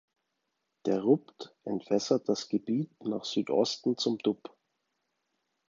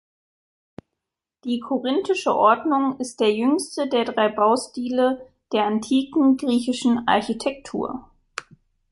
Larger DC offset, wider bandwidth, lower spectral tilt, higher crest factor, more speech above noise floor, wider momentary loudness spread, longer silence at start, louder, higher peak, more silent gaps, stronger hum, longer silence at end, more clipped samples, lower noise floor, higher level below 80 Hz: neither; second, 7.6 kHz vs 11.5 kHz; about the same, -5.5 dB/octave vs -4.5 dB/octave; about the same, 20 dB vs 18 dB; second, 52 dB vs 63 dB; about the same, 10 LU vs 12 LU; second, 0.85 s vs 1.45 s; second, -31 LUFS vs -22 LUFS; second, -12 dBFS vs -4 dBFS; neither; neither; first, 1.35 s vs 0.5 s; neither; about the same, -82 dBFS vs -84 dBFS; second, -78 dBFS vs -62 dBFS